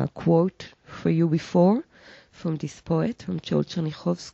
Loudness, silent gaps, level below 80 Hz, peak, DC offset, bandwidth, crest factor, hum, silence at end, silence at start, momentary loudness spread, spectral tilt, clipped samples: -25 LUFS; none; -58 dBFS; -8 dBFS; under 0.1%; 7.8 kHz; 16 dB; none; 0.05 s; 0 s; 12 LU; -8 dB/octave; under 0.1%